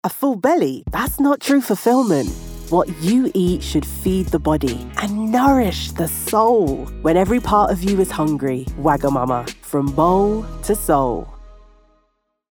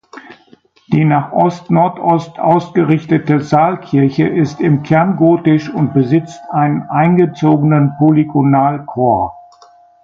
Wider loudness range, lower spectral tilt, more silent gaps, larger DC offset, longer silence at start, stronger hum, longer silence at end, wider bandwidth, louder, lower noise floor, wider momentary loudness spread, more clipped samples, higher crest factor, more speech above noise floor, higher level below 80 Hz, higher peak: about the same, 2 LU vs 1 LU; second, -6 dB/octave vs -9 dB/octave; neither; neither; about the same, 0.05 s vs 0.15 s; neither; first, 0.95 s vs 0.65 s; first, over 20 kHz vs 7.2 kHz; second, -18 LUFS vs -13 LUFS; first, -67 dBFS vs -48 dBFS; first, 7 LU vs 4 LU; neither; about the same, 16 dB vs 12 dB; first, 49 dB vs 36 dB; first, -34 dBFS vs -50 dBFS; about the same, -2 dBFS vs 0 dBFS